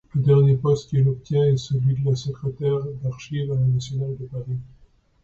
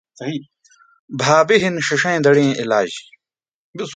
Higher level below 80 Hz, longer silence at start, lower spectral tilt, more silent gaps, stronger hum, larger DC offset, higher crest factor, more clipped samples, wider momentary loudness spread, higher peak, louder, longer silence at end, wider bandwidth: first, -50 dBFS vs -62 dBFS; about the same, 0.15 s vs 0.2 s; first, -8.5 dB/octave vs -4.5 dB/octave; second, none vs 0.99-1.08 s, 3.48-3.73 s; neither; neither; about the same, 14 dB vs 18 dB; neither; second, 13 LU vs 18 LU; second, -8 dBFS vs 0 dBFS; second, -22 LUFS vs -16 LUFS; first, 0.55 s vs 0 s; second, 7.4 kHz vs 9.4 kHz